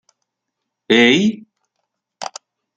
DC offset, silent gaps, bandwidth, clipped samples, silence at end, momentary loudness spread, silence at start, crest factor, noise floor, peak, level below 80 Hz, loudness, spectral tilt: under 0.1%; none; 9 kHz; under 0.1%; 0.5 s; 20 LU; 0.9 s; 20 dB; -79 dBFS; 0 dBFS; -66 dBFS; -14 LUFS; -4 dB/octave